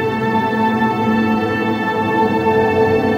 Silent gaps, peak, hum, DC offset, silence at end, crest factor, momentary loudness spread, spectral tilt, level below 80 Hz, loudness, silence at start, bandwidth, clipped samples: none; -2 dBFS; none; under 0.1%; 0 s; 12 dB; 3 LU; -7.5 dB/octave; -48 dBFS; -16 LUFS; 0 s; 15.5 kHz; under 0.1%